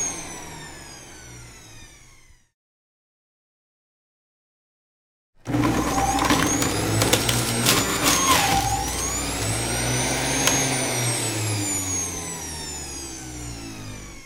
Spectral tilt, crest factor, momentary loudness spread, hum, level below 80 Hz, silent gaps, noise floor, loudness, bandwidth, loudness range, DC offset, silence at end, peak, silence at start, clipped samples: -3 dB/octave; 22 dB; 19 LU; none; -40 dBFS; 2.54-5.33 s; -51 dBFS; -22 LUFS; 16 kHz; 11 LU; under 0.1%; 0 s; -2 dBFS; 0 s; under 0.1%